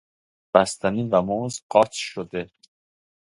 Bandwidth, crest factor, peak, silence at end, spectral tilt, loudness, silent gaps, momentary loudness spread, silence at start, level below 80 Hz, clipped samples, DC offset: 11.5 kHz; 24 dB; 0 dBFS; 0.8 s; -5 dB/octave; -23 LUFS; 1.62-1.70 s; 12 LU; 0.55 s; -58 dBFS; under 0.1%; under 0.1%